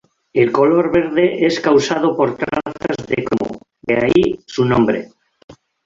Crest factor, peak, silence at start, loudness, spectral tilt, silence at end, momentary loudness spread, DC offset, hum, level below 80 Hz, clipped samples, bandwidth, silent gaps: 16 dB; -2 dBFS; 0.35 s; -16 LUFS; -6 dB/octave; 0.35 s; 9 LU; under 0.1%; none; -48 dBFS; under 0.1%; 7.6 kHz; 5.44-5.48 s